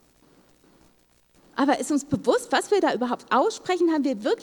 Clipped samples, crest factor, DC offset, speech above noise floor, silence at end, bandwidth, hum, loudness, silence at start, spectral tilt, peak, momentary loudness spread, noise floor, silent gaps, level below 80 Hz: under 0.1%; 18 dB; under 0.1%; 38 dB; 0 s; 19 kHz; none; -24 LUFS; 1.55 s; -4 dB/octave; -8 dBFS; 3 LU; -61 dBFS; none; -64 dBFS